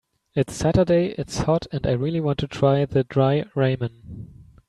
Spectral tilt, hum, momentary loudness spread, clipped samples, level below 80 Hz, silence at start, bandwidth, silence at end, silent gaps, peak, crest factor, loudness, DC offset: -7 dB/octave; none; 10 LU; under 0.1%; -44 dBFS; 0.35 s; 12 kHz; 0.25 s; none; -6 dBFS; 16 dB; -22 LUFS; under 0.1%